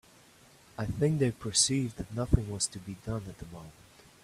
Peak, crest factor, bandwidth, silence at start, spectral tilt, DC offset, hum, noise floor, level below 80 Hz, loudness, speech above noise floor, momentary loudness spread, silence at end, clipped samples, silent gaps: -10 dBFS; 24 dB; 15 kHz; 0.8 s; -4 dB/octave; under 0.1%; none; -59 dBFS; -44 dBFS; -30 LUFS; 27 dB; 21 LU; 0.5 s; under 0.1%; none